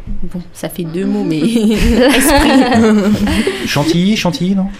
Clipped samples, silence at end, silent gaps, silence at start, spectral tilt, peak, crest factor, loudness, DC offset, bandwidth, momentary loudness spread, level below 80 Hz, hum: under 0.1%; 0 s; none; 0 s; -5 dB/octave; 0 dBFS; 12 dB; -12 LUFS; under 0.1%; 15.5 kHz; 15 LU; -24 dBFS; none